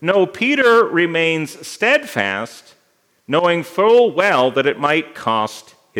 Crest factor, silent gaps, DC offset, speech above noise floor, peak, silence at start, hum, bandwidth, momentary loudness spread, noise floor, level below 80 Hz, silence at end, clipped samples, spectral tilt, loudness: 16 dB; none; under 0.1%; 45 dB; 0 dBFS; 0 s; none; 16.5 kHz; 10 LU; -61 dBFS; -72 dBFS; 0 s; under 0.1%; -4.5 dB/octave; -16 LUFS